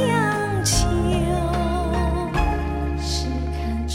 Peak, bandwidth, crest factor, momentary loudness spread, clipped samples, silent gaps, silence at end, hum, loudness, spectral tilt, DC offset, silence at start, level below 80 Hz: -8 dBFS; 16.5 kHz; 14 dB; 6 LU; under 0.1%; none; 0 s; none; -22 LUFS; -5 dB/octave; 0.2%; 0 s; -26 dBFS